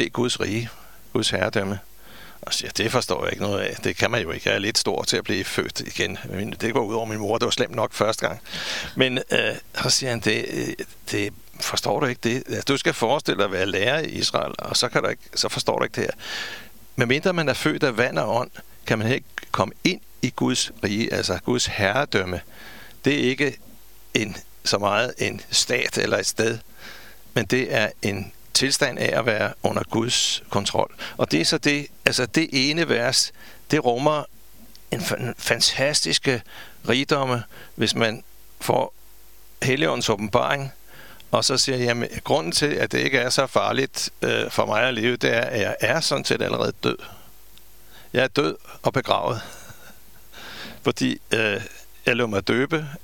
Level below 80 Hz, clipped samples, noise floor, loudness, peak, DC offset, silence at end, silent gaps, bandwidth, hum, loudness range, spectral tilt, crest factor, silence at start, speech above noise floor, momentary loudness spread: -54 dBFS; under 0.1%; -52 dBFS; -23 LUFS; 0 dBFS; 0.7%; 0.05 s; none; 19 kHz; none; 4 LU; -3.5 dB/octave; 24 dB; 0 s; 28 dB; 10 LU